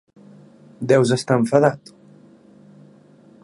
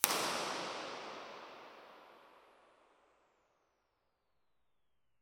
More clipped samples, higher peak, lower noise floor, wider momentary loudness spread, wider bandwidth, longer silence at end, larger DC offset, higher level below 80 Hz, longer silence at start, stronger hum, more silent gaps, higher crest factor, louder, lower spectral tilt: neither; about the same, 0 dBFS vs 0 dBFS; second, -49 dBFS vs -87 dBFS; second, 14 LU vs 24 LU; second, 11.5 kHz vs 17 kHz; second, 1.65 s vs 2.8 s; neither; first, -64 dBFS vs -88 dBFS; first, 0.8 s vs 0 s; first, 50 Hz at -50 dBFS vs none; neither; second, 22 dB vs 44 dB; first, -18 LUFS vs -39 LUFS; first, -6 dB/octave vs -0.5 dB/octave